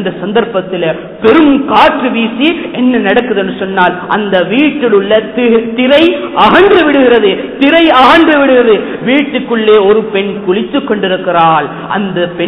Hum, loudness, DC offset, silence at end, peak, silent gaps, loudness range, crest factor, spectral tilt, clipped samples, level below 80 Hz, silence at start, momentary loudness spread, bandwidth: none; -8 LUFS; under 0.1%; 0 s; 0 dBFS; none; 4 LU; 8 dB; -7.5 dB/octave; 0.7%; -42 dBFS; 0 s; 8 LU; 5.4 kHz